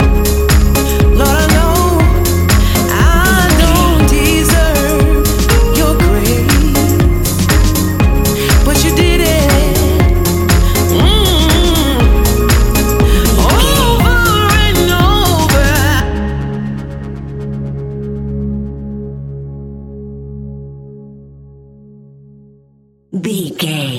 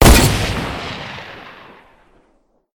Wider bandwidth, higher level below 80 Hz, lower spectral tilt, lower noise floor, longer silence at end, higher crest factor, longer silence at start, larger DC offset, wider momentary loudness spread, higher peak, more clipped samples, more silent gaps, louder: second, 17 kHz vs 19.5 kHz; first, -14 dBFS vs -22 dBFS; about the same, -5 dB/octave vs -4 dB/octave; second, -50 dBFS vs -59 dBFS; second, 0 s vs 1.25 s; second, 10 dB vs 16 dB; about the same, 0 s vs 0 s; neither; second, 15 LU vs 24 LU; about the same, 0 dBFS vs 0 dBFS; neither; neither; first, -11 LUFS vs -17 LUFS